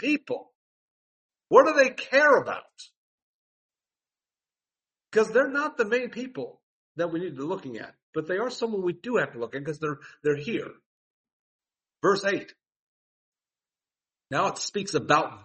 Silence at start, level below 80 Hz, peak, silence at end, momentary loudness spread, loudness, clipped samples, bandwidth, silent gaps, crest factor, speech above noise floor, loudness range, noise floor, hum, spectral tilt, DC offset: 0 s; -74 dBFS; -4 dBFS; 0.05 s; 16 LU; -26 LUFS; under 0.1%; 8.4 kHz; 0.55-1.29 s, 2.97-3.69 s, 6.63-6.95 s, 8.03-8.13 s, 10.86-11.24 s, 11.32-11.59 s, 12.76-13.32 s; 24 dB; over 64 dB; 8 LU; under -90 dBFS; none; -4.5 dB/octave; under 0.1%